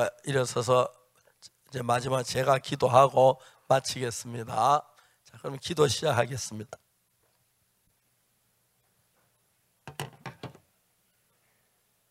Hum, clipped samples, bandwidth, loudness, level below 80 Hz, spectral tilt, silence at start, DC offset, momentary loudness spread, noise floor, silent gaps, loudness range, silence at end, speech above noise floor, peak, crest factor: none; under 0.1%; 16 kHz; -27 LUFS; -68 dBFS; -4.5 dB/octave; 0 s; under 0.1%; 20 LU; -72 dBFS; none; 22 LU; 1.6 s; 45 dB; -6 dBFS; 24 dB